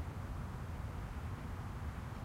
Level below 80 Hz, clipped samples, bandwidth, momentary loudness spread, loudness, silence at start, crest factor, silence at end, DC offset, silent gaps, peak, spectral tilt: -48 dBFS; under 0.1%; 16 kHz; 0 LU; -45 LUFS; 0 s; 12 dB; 0 s; under 0.1%; none; -32 dBFS; -7 dB/octave